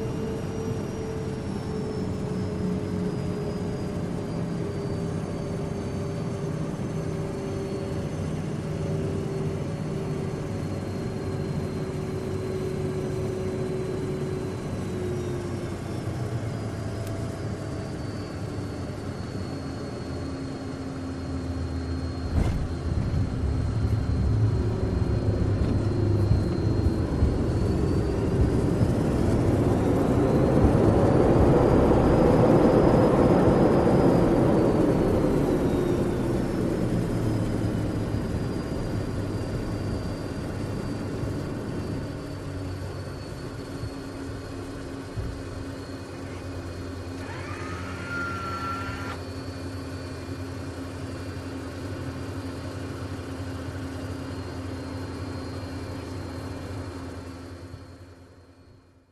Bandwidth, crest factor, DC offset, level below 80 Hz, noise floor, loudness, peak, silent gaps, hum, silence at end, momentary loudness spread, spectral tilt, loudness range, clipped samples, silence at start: 13 kHz; 20 dB; under 0.1%; -36 dBFS; -54 dBFS; -27 LUFS; -6 dBFS; none; none; 0.5 s; 15 LU; -8 dB/octave; 14 LU; under 0.1%; 0 s